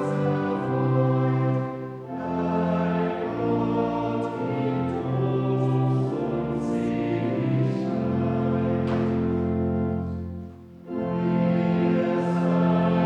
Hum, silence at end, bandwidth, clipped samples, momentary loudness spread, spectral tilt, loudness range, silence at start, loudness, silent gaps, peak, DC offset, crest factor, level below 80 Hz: none; 0 s; 7.4 kHz; under 0.1%; 7 LU; -9.5 dB/octave; 1 LU; 0 s; -25 LUFS; none; -10 dBFS; under 0.1%; 14 dB; -50 dBFS